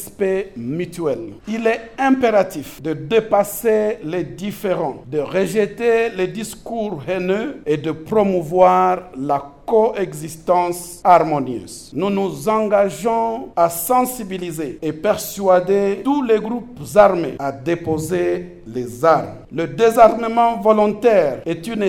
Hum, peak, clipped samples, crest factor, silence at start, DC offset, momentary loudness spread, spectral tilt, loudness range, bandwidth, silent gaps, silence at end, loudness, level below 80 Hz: none; 0 dBFS; under 0.1%; 18 dB; 0 s; under 0.1%; 13 LU; -5.5 dB/octave; 4 LU; 18.5 kHz; none; 0 s; -18 LUFS; -48 dBFS